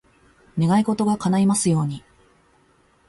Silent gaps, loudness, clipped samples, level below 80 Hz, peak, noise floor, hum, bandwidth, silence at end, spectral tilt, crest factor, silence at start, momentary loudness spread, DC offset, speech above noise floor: none; -21 LUFS; under 0.1%; -56 dBFS; -8 dBFS; -59 dBFS; none; 11.5 kHz; 1.1 s; -6 dB/octave; 16 dB; 0.55 s; 11 LU; under 0.1%; 40 dB